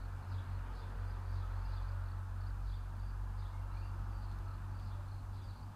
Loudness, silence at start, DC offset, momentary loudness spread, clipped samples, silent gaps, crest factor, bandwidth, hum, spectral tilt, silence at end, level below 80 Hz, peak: -44 LUFS; 0 s; under 0.1%; 3 LU; under 0.1%; none; 10 dB; 10 kHz; none; -7 dB/octave; 0 s; -44 dBFS; -30 dBFS